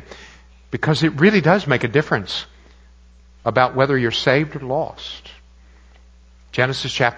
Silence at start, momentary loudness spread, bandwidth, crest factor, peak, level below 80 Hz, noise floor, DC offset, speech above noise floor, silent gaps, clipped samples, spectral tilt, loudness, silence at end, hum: 0 s; 17 LU; 8 kHz; 20 dB; 0 dBFS; -48 dBFS; -48 dBFS; under 0.1%; 29 dB; none; under 0.1%; -6 dB/octave; -18 LUFS; 0 s; none